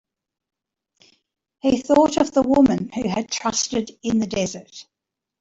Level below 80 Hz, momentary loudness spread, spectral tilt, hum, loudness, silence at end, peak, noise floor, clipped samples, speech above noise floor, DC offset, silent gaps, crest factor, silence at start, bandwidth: -52 dBFS; 9 LU; -4.5 dB/octave; none; -20 LUFS; 0.6 s; -4 dBFS; -85 dBFS; under 0.1%; 65 dB; under 0.1%; none; 18 dB; 1.65 s; 8 kHz